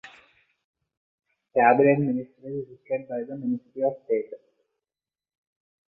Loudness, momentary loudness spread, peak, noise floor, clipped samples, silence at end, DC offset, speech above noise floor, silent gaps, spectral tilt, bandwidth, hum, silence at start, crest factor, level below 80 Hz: -25 LUFS; 17 LU; -4 dBFS; under -90 dBFS; under 0.1%; 1.6 s; under 0.1%; over 66 dB; 0.64-0.74 s, 0.97-1.18 s; -10 dB/octave; 4.3 kHz; none; 0.05 s; 22 dB; -72 dBFS